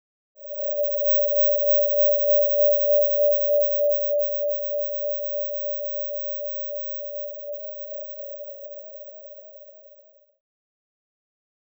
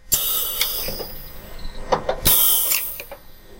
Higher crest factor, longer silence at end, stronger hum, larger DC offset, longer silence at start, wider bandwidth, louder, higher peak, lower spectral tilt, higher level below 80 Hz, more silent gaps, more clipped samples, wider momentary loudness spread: second, 12 dB vs 22 dB; first, 1.75 s vs 0 s; neither; neither; first, 0.4 s vs 0.05 s; first, over 20 kHz vs 16.5 kHz; second, -22 LUFS vs -18 LUFS; second, -12 dBFS vs -2 dBFS; first, -6.5 dB/octave vs -1 dB/octave; second, under -90 dBFS vs -36 dBFS; neither; neither; second, 19 LU vs 25 LU